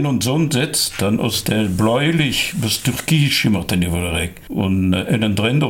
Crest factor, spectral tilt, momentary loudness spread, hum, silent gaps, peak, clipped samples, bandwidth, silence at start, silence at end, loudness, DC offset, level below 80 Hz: 12 dB; -4.5 dB/octave; 4 LU; none; none; -4 dBFS; under 0.1%; 17 kHz; 0 s; 0 s; -18 LUFS; under 0.1%; -40 dBFS